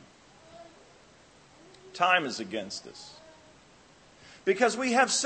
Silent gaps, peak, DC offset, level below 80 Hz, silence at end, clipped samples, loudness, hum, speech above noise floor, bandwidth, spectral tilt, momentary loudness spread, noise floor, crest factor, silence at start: none; -8 dBFS; under 0.1%; -72 dBFS; 0 s; under 0.1%; -27 LUFS; none; 30 dB; 8.8 kHz; -2 dB/octave; 25 LU; -57 dBFS; 22 dB; 0.55 s